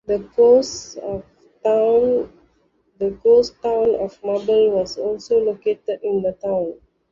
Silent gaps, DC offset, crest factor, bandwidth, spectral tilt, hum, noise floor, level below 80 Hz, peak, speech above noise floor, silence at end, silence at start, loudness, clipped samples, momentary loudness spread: none; under 0.1%; 16 dB; 7.6 kHz; -5 dB/octave; none; -62 dBFS; -54 dBFS; -4 dBFS; 44 dB; 0.4 s; 0.1 s; -19 LUFS; under 0.1%; 14 LU